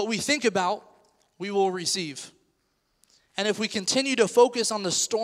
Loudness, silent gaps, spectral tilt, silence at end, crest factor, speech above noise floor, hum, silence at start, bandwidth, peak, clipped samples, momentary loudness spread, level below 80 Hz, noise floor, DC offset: -25 LUFS; none; -2.5 dB/octave; 0 s; 20 dB; 47 dB; none; 0 s; 15.5 kHz; -6 dBFS; under 0.1%; 15 LU; -72 dBFS; -72 dBFS; under 0.1%